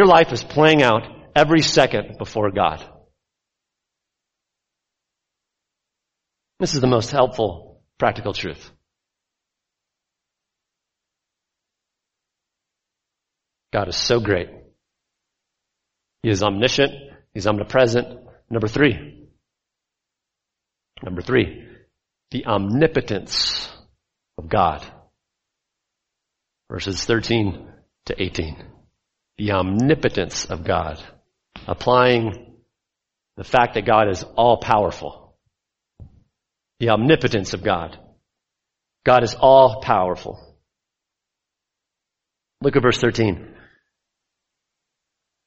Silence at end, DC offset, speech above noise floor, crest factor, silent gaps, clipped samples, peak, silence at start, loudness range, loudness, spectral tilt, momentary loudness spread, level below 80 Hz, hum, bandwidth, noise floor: 2 s; under 0.1%; 65 dB; 22 dB; none; under 0.1%; 0 dBFS; 0 s; 9 LU; -19 LUFS; -5 dB/octave; 17 LU; -46 dBFS; none; 8.2 kHz; -84 dBFS